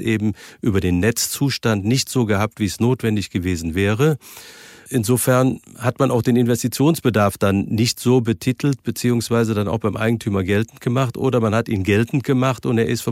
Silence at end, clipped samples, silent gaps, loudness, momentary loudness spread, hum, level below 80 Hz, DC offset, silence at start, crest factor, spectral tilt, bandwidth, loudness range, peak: 0 s; under 0.1%; none; -19 LUFS; 5 LU; none; -48 dBFS; under 0.1%; 0 s; 14 dB; -5.5 dB/octave; 16.5 kHz; 2 LU; -4 dBFS